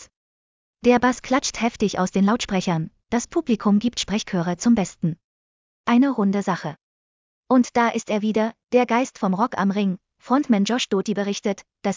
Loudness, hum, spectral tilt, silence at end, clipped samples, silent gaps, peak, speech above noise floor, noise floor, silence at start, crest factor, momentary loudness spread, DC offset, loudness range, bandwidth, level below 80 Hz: -22 LUFS; none; -5.5 dB/octave; 0 s; under 0.1%; 0.16-0.74 s, 5.24-5.84 s, 6.83-7.43 s; -4 dBFS; over 69 dB; under -90 dBFS; 0 s; 18 dB; 7 LU; under 0.1%; 2 LU; 7.6 kHz; -54 dBFS